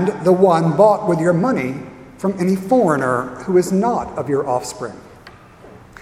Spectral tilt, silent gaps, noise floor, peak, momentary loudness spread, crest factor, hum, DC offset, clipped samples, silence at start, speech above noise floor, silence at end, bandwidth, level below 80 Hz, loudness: -7 dB/octave; none; -42 dBFS; 0 dBFS; 13 LU; 18 dB; none; under 0.1%; under 0.1%; 0 s; 26 dB; 0.3 s; 15 kHz; -52 dBFS; -17 LUFS